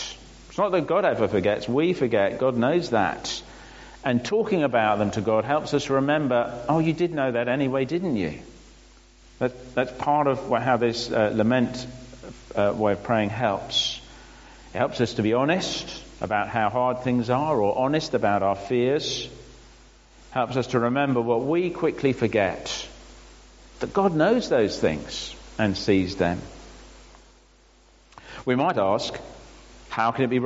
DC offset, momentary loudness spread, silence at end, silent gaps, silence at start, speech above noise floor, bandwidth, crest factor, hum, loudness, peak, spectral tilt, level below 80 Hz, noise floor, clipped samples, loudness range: under 0.1%; 12 LU; 0 s; none; 0 s; 32 dB; 8 kHz; 18 dB; none; -24 LUFS; -6 dBFS; -4.5 dB/octave; -52 dBFS; -56 dBFS; under 0.1%; 4 LU